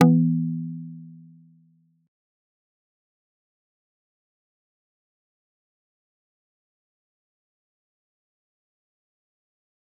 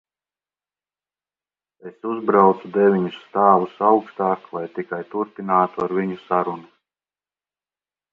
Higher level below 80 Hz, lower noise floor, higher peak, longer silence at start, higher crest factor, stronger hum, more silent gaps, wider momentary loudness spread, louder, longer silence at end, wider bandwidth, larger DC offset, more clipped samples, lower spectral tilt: second, -82 dBFS vs -70 dBFS; second, -62 dBFS vs under -90 dBFS; about the same, -2 dBFS vs 0 dBFS; second, 0 s vs 1.85 s; first, 28 dB vs 22 dB; second, none vs 50 Hz at -45 dBFS; neither; first, 24 LU vs 13 LU; second, -23 LUFS vs -20 LUFS; first, 8.85 s vs 1.5 s; second, 3.7 kHz vs 4.9 kHz; neither; neither; about the same, -8.5 dB/octave vs -9.5 dB/octave